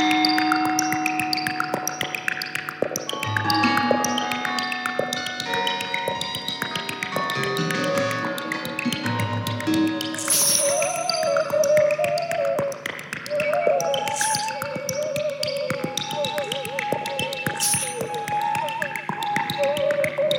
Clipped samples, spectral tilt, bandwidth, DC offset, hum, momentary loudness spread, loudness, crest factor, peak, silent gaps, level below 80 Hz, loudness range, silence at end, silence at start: under 0.1%; -3 dB/octave; 19 kHz; under 0.1%; none; 8 LU; -23 LUFS; 18 dB; -4 dBFS; none; -64 dBFS; 4 LU; 0 s; 0 s